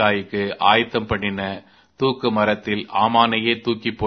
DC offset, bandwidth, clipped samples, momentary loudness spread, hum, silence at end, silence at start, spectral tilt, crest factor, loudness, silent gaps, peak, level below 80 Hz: under 0.1%; 6.4 kHz; under 0.1%; 9 LU; none; 0 s; 0 s; -7 dB/octave; 20 dB; -20 LUFS; none; 0 dBFS; -50 dBFS